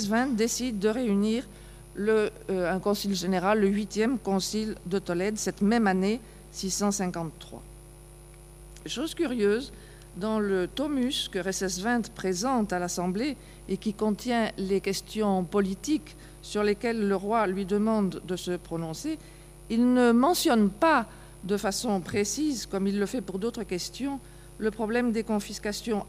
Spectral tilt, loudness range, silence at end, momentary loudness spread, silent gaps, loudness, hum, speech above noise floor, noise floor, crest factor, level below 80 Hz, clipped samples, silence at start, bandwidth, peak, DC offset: -4.5 dB/octave; 5 LU; 0 s; 11 LU; none; -28 LUFS; 60 Hz at -60 dBFS; 21 dB; -48 dBFS; 18 dB; -50 dBFS; under 0.1%; 0 s; 15.5 kHz; -10 dBFS; under 0.1%